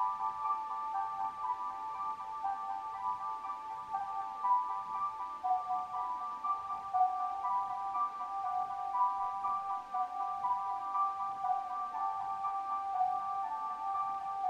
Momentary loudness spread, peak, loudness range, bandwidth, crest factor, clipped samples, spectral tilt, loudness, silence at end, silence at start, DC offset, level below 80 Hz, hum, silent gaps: 6 LU; -20 dBFS; 3 LU; 10.5 kHz; 16 dB; under 0.1%; -3.5 dB/octave; -36 LUFS; 0 s; 0 s; under 0.1%; -74 dBFS; none; none